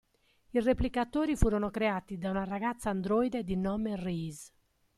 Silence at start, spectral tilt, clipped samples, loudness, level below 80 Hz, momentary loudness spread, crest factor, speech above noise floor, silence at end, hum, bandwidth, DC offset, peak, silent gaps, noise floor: 0.55 s; -6.5 dB/octave; under 0.1%; -32 LUFS; -44 dBFS; 6 LU; 22 dB; 36 dB; 0.5 s; none; 14 kHz; under 0.1%; -10 dBFS; none; -67 dBFS